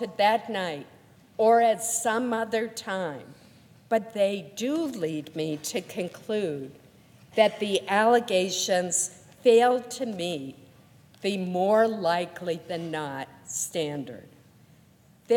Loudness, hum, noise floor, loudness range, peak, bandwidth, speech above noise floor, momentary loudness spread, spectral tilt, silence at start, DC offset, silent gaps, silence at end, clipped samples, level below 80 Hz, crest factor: -26 LUFS; none; -58 dBFS; 7 LU; -6 dBFS; 17.5 kHz; 32 dB; 13 LU; -3.5 dB/octave; 0 s; under 0.1%; none; 0 s; under 0.1%; -74 dBFS; 20 dB